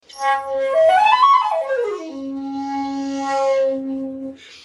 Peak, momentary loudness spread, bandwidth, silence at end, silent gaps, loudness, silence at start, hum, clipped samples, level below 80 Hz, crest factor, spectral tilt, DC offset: -2 dBFS; 15 LU; 12 kHz; 0.05 s; none; -18 LUFS; 0.1 s; none; under 0.1%; -66 dBFS; 18 dB; -3 dB/octave; under 0.1%